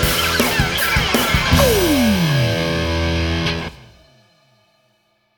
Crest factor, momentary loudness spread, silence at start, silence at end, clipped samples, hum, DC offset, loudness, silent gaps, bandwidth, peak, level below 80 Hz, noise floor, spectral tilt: 18 dB; 6 LU; 0 s; 1.6 s; under 0.1%; none; under 0.1%; -16 LUFS; none; over 20 kHz; 0 dBFS; -28 dBFS; -63 dBFS; -4.5 dB/octave